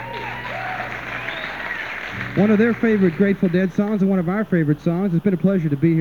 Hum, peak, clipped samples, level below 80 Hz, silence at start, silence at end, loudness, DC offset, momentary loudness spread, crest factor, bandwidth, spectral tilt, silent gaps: none; -4 dBFS; under 0.1%; -50 dBFS; 0 s; 0 s; -20 LUFS; 0.3%; 10 LU; 14 dB; 7 kHz; -8.5 dB/octave; none